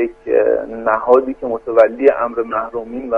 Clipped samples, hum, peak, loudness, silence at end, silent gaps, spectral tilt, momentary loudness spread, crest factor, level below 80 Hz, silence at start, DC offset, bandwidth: under 0.1%; none; 0 dBFS; -16 LUFS; 0 s; none; -7.5 dB/octave; 10 LU; 16 dB; -48 dBFS; 0 s; under 0.1%; 5 kHz